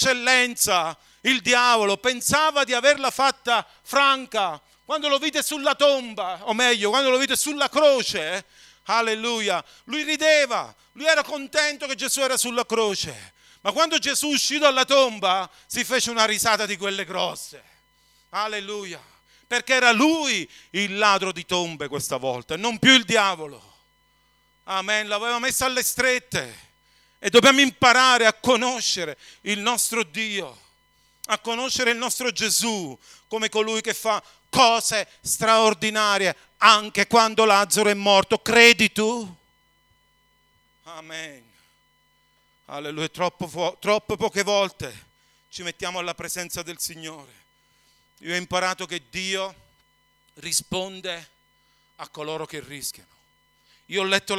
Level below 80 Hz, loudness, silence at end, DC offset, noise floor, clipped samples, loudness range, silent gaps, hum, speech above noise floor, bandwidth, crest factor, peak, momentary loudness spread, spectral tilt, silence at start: -60 dBFS; -21 LUFS; 0 s; under 0.1%; -64 dBFS; under 0.1%; 11 LU; none; none; 42 dB; 17.5 kHz; 24 dB; 0 dBFS; 15 LU; -1.5 dB/octave; 0 s